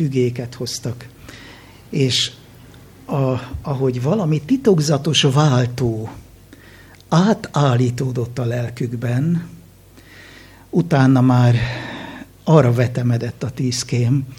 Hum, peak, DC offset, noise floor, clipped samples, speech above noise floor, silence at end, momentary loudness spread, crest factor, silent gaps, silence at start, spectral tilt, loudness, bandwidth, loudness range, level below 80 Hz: none; 0 dBFS; under 0.1%; -45 dBFS; under 0.1%; 28 dB; 0.05 s; 14 LU; 18 dB; none; 0 s; -6 dB/octave; -18 LUFS; 15 kHz; 6 LU; -46 dBFS